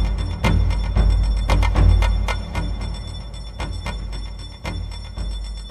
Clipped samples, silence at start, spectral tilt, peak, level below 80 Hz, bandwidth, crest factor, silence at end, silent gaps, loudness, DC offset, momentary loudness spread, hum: under 0.1%; 0 s; -6 dB/octave; -4 dBFS; -22 dBFS; 10.5 kHz; 16 dB; 0 s; none; -23 LUFS; under 0.1%; 15 LU; none